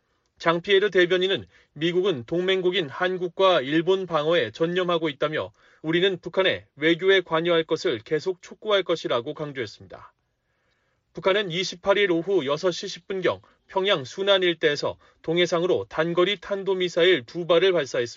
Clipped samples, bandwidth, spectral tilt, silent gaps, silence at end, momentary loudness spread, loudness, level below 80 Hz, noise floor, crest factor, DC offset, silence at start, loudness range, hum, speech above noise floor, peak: under 0.1%; 7.6 kHz; -2.5 dB/octave; none; 0 s; 10 LU; -23 LUFS; -66 dBFS; -72 dBFS; 16 dB; under 0.1%; 0.4 s; 4 LU; none; 49 dB; -8 dBFS